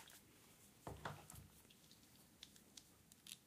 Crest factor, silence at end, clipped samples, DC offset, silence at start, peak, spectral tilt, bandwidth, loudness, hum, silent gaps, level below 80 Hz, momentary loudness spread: 30 dB; 0 s; under 0.1%; under 0.1%; 0 s; -30 dBFS; -3 dB/octave; 15.5 kHz; -60 LUFS; none; none; -74 dBFS; 12 LU